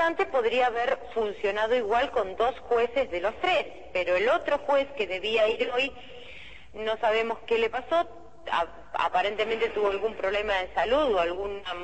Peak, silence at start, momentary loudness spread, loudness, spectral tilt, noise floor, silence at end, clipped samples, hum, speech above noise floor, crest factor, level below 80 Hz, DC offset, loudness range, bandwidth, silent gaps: -12 dBFS; 0 s; 8 LU; -27 LUFS; -4 dB/octave; -47 dBFS; 0 s; under 0.1%; none; 20 dB; 14 dB; -54 dBFS; 0.5%; 2 LU; 8.6 kHz; none